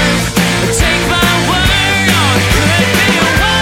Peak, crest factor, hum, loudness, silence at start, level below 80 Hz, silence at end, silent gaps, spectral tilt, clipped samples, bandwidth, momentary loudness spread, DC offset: 0 dBFS; 10 dB; none; -10 LUFS; 0 s; -22 dBFS; 0 s; none; -3.5 dB/octave; under 0.1%; 16.5 kHz; 2 LU; under 0.1%